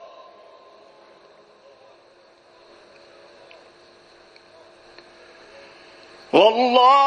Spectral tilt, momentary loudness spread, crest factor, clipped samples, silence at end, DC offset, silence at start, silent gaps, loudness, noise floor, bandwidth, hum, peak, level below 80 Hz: -4 dB/octave; 30 LU; 22 dB; under 0.1%; 0 s; under 0.1%; 6.35 s; none; -16 LUFS; -53 dBFS; 9.6 kHz; none; -2 dBFS; -74 dBFS